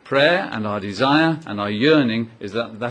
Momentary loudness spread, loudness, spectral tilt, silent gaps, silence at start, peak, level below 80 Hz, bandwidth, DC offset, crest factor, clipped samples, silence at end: 10 LU; -19 LUFS; -6.5 dB/octave; none; 0.05 s; -2 dBFS; -60 dBFS; 9.6 kHz; under 0.1%; 18 dB; under 0.1%; 0 s